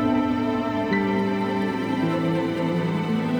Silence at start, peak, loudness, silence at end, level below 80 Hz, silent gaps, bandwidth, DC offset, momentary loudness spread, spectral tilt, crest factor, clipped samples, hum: 0 s; -10 dBFS; -24 LUFS; 0 s; -54 dBFS; none; 19.5 kHz; under 0.1%; 2 LU; -7.5 dB/octave; 14 dB; under 0.1%; none